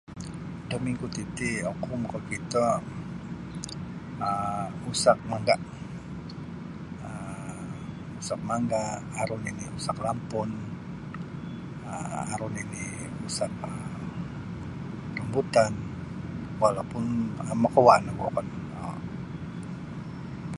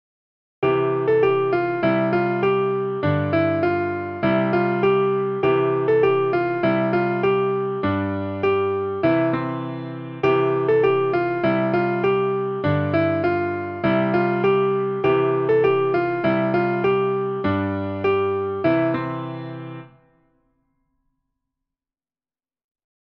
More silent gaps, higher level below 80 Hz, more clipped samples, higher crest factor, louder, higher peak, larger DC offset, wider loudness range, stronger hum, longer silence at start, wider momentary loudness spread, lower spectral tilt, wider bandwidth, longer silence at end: neither; first, -52 dBFS vs -58 dBFS; neither; first, 28 dB vs 14 dB; second, -30 LUFS vs -21 LUFS; first, -2 dBFS vs -8 dBFS; neither; first, 9 LU vs 4 LU; neither; second, 0.1 s vs 0.6 s; first, 14 LU vs 6 LU; second, -5.5 dB/octave vs -9.5 dB/octave; first, 11.5 kHz vs 5.6 kHz; second, 0 s vs 3.3 s